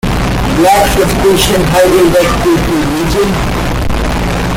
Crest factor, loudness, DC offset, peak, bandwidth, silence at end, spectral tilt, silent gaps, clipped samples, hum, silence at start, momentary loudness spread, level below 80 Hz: 10 dB; -10 LUFS; under 0.1%; 0 dBFS; 17 kHz; 0 s; -5 dB/octave; none; under 0.1%; none; 0.05 s; 7 LU; -20 dBFS